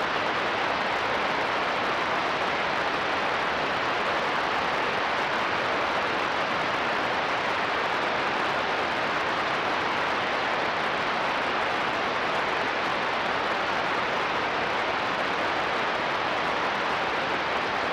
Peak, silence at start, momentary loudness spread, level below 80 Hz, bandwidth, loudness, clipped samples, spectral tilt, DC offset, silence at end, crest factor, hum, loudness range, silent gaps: -16 dBFS; 0 s; 1 LU; -58 dBFS; 16 kHz; -26 LUFS; under 0.1%; -3.5 dB/octave; under 0.1%; 0 s; 12 dB; none; 0 LU; none